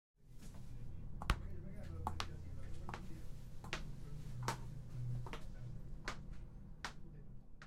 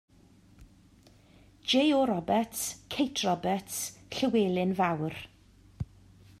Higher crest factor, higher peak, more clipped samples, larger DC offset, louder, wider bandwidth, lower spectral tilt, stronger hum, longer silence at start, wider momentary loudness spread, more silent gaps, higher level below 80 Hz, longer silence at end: first, 28 dB vs 18 dB; second, -18 dBFS vs -14 dBFS; neither; neither; second, -49 LUFS vs -29 LUFS; about the same, 15 kHz vs 15 kHz; about the same, -5 dB/octave vs -4.5 dB/octave; neither; second, 0.2 s vs 0.6 s; second, 13 LU vs 17 LU; neither; first, -50 dBFS vs -60 dBFS; second, 0 s vs 0.55 s